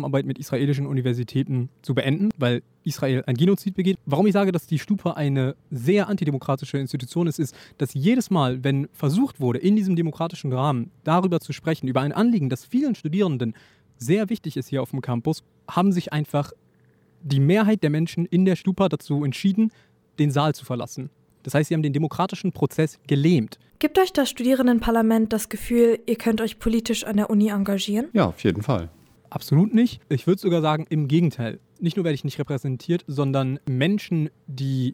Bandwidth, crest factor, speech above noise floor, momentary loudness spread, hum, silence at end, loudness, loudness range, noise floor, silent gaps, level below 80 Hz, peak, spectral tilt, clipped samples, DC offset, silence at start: 18 kHz; 16 dB; 37 dB; 8 LU; none; 0 s; -23 LUFS; 4 LU; -59 dBFS; none; -50 dBFS; -6 dBFS; -7 dB/octave; under 0.1%; under 0.1%; 0 s